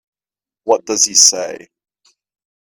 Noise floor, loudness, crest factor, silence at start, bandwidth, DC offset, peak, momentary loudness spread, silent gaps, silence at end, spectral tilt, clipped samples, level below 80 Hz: under -90 dBFS; -11 LUFS; 18 dB; 0.65 s; over 20 kHz; under 0.1%; 0 dBFS; 19 LU; none; 1.05 s; 0.5 dB/octave; under 0.1%; -66 dBFS